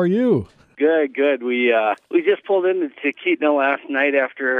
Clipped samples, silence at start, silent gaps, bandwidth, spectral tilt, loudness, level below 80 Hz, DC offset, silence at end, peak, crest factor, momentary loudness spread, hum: under 0.1%; 0 s; none; 4.5 kHz; -8 dB/octave; -19 LUFS; -62 dBFS; under 0.1%; 0 s; -6 dBFS; 14 dB; 4 LU; none